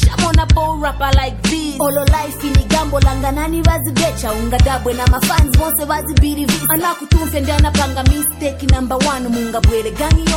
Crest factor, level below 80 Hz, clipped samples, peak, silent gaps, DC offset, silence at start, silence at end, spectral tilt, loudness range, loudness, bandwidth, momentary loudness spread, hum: 12 dB; -18 dBFS; under 0.1%; -2 dBFS; none; under 0.1%; 0 s; 0 s; -5 dB/octave; 1 LU; -15 LUFS; 17 kHz; 5 LU; none